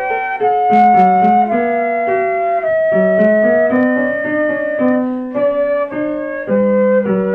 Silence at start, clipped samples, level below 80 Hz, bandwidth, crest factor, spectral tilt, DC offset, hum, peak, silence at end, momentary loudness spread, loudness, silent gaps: 0 s; under 0.1%; -52 dBFS; 4.8 kHz; 12 dB; -9.5 dB/octave; under 0.1%; none; -2 dBFS; 0 s; 7 LU; -14 LUFS; none